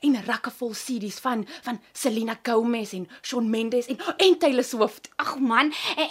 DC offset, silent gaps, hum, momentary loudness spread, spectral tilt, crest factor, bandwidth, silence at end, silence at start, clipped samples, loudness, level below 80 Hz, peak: under 0.1%; none; none; 10 LU; -3.5 dB/octave; 20 dB; 16 kHz; 0 s; 0 s; under 0.1%; -25 LUFS; -76 dBFS; -4 dBFS